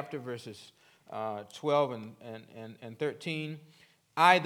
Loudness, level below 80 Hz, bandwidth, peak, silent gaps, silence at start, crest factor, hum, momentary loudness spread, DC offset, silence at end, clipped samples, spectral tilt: -32 LUFS; -86 dBFS; 19.5 kHz; -8 dBFS; none; 0 s; 26 dB; none; 19 LU; under 0.1%; 0 s; under 0.1%; -5 dB/octave